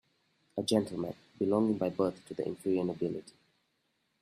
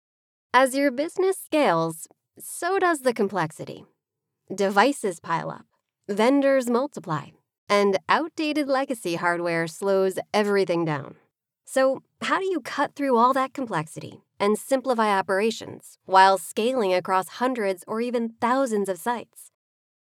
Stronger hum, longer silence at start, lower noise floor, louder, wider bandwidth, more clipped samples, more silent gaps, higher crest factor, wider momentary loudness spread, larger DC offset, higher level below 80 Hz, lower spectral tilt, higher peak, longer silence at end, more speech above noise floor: neither; about the same, 0.55 s vs 0.55 s; second, -78 dBFS vs -82 dBFS; second, -33 LUFS vs -24 LUFS; second, 14 kHz vs 16.5 kHz; neither; second, none vs 7.58-7.67 s; about the same, 20 dB vs 22 dB; about the same, 10 LU vs 12 LU; neither; first, -72 dBFS vs under -90 dBFS; first, -6.5 dB/octave vs -4.5 dB/octave; second, -14 dBFS vs -4 dBFS; first, 0.9 s vs 0.6 s; second, 46 dB vs 59 dB